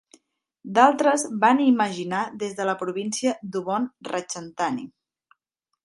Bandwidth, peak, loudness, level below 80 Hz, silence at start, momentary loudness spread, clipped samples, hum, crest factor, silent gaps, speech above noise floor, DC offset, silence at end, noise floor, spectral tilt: 11.5 kHz; -2 dBFS; -23 LUFS; -74 dBFS; 0.65 s; 12 LU; under 0.1%; none; 22 dB; none; 58 dB; under 0.1%; 0.95 s; -81 dBFS; -4 dB/octave